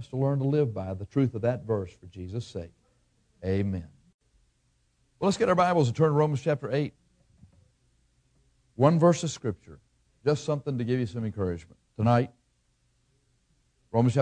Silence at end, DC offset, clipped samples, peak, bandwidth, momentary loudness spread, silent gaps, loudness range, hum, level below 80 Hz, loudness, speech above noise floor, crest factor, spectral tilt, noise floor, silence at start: 0 s; under 0.1%; under 0.1%; -8 dBFS; 10 kHz; 15 LU; 4.14-4.19 s; 6 LU; none; -60 dBFS; -27 LUFS; 44 dB; 22 dB; -7 dB/octave; -70 dBFS; 0 s